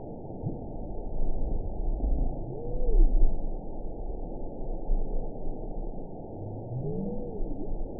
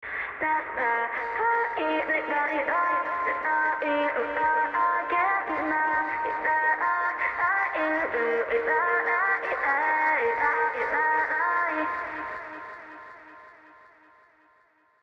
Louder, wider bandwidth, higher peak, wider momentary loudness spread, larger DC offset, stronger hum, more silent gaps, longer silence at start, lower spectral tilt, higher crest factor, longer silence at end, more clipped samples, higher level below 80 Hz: second, -36 LUFS vs -25 LUFS; second, 1 kHz vs 6.6 kHz; about the same, -10 dBFS vs -12 dBFS; first, 10 LU vs 6 LU; first, 0.5% vs under 0.1%; neither; neither; about the same, 0 s vs 0 s; first, -16.5 dB/octave vs -5 dB/octave; about the same, 18 dB vs 14 dB; second, 0 s vs 1.5 s; neither; first, -28 dBFS vs -64 dBFS